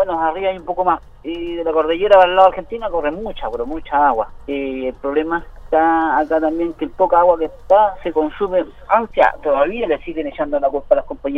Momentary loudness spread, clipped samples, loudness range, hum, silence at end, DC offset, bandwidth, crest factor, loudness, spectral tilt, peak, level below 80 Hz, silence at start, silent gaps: 11 LU; under 0.1%; 3 LU; none; 0 s; under 0.1%; 5.6 kHz; 16 dB; -17 LUFS; -6.5 dB/octave; 0 dBFS; -40 dBFS; 0 s; none